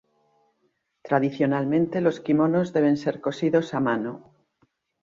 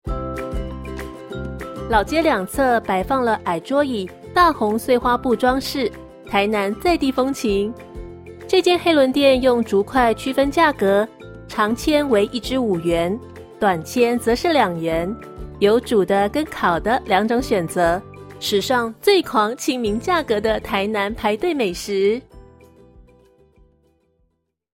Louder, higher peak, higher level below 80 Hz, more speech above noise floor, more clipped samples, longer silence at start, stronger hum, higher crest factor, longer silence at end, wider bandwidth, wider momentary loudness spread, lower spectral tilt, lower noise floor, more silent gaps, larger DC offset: second, -24 LUFS vs -19 LUFS; second, -8 dBFS vs -2 dBFS; second, -66 dBFS vs -40 dBFS; about the same, 49 dB vs 51 dB; neither; first, 1.05 s vs 0.05 s; neither; about the same, 18 dB vs 16 dB; second, 0.85 s vs 1.75 s; second, 7.4 kHz vs 16.5 kHz; second, 6 LU vs 13 LU; first, -8 dB/octave vs -5 dB/octave; about the same, -72 dBFS vs -69 dBFS; neither; neither